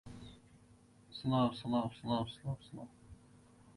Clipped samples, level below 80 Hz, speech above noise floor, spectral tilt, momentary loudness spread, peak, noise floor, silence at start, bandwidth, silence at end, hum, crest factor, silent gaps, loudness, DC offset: under 0.1%; -64 dBFS; 27 dB; -7.5 dB/octave; 21 LU; -20 dBFS; -64 dBFS; 0.05 s; 11.5 kHz; 0.05 s; none; 20 dB; none; -37 LUFS; under 0.1%